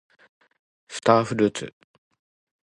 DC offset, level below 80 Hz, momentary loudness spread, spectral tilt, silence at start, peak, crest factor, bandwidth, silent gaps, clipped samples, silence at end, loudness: under 0.1%; -64 dBFS; 18 LU; -5.5 dB/octave; 0.9 s; -2 dBFS; 24 dB; 11.5 kHz; none; under 0.1%; 0.95 s; -22 LUFS